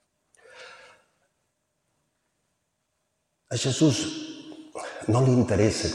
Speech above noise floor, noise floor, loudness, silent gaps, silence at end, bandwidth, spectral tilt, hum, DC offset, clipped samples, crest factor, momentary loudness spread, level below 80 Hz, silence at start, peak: 54 dB; -77 dBFS; -24 LUFS; none; 0 s; 11.5 kHz; -5.5 dB/octave; none; under 0.1%; under 0.1%; 20 dB; 22 LU; -54 dBFS; 0.55 s; -8 dBFS